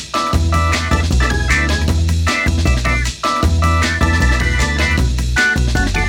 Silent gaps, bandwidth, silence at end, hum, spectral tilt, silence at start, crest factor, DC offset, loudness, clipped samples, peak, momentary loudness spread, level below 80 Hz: none; 15.5 kHz; 0 s; none; -4.5 dB/octave; 0 s; 14 dB; under 0.1%; -15 LUFS; under 0.1%; -2 dBFS; 2 LU; -18 dBFS